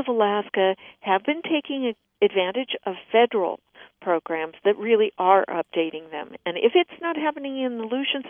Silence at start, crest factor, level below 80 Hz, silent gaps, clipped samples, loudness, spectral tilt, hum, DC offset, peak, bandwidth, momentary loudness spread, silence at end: 0 s; 20 dB; -76 dBFS; none; under 0.1%; -24 LUFS; -8 dB/octave; none; under 0.1%; -4 dBFS; 3.7 kHz; 10 LU; 0 s